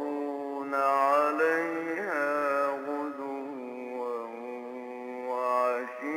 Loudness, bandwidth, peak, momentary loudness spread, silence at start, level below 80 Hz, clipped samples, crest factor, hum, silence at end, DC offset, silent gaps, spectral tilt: -30 LUFS; 16 kHz; -14 dBFS; 14 LU; 0 s; -86 dBFS; under 0.1%; 16 dB; none; 0 s; under 0.1%; none; -4.5 dB/octave